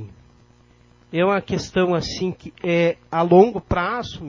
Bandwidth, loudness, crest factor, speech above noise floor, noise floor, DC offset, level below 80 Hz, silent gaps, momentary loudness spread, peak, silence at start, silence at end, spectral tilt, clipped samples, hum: 7.6 kHz; -20 LUFS; 20 dB; 34 dB; -53 dBFS; under 0.1%; -44 dBFS; none; 12 LU; 0 dBFS; 0 s; 0 s; -6.5 dB/octave; under 0.1%; none